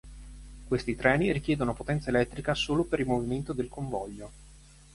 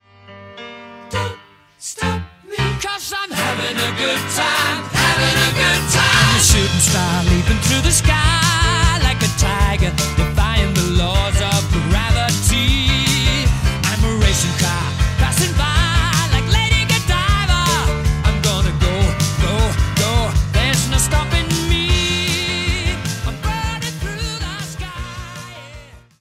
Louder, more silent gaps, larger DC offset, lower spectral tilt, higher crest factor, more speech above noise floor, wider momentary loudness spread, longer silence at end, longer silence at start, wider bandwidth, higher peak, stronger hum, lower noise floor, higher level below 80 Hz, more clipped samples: second, -29 LUFS vs -16 LUFS; neither; neither; first, -6 dB/octave vs -3.5 dB/octave; first, 22 dB vs 14 dB; about the same, 24 dB vs 25 dB; first, 21 LU vs 10 LU; first, 0.35 s vs 0.2 s; second, 0.05 s vs 0.3 s; second, 11.5 kHz vs 16 kHz; second, -8 dBFS vs -2 dBFS; neither; first, -53 dBFS vs -42 dBFS; second, -46 dBFS vs -22 dBFS; neither